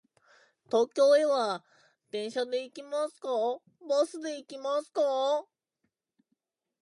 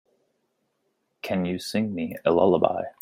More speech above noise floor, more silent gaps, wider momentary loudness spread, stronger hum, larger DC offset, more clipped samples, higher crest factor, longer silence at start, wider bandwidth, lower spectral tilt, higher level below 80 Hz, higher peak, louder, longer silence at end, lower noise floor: about the same, 53 dB vs 51 dB; neither; first, 14 LU vs 9 LU; neither; neither; neither; about the same, 18 dB vs 22 dB; second, 0.7 s vs 1.25 s; second, 11.5 kHz vs 16 kHz; second, -3 dB/octave vs -6.5 dB/octave; second, -88 dBFS vs -66 dBFS; second, -14 dBFS vs -4 dBFS; second, -30 LUFS vs -24 LUFS; first, 1.4 s vs 0.1 s; first, -82 dBFS vs -74 dBFS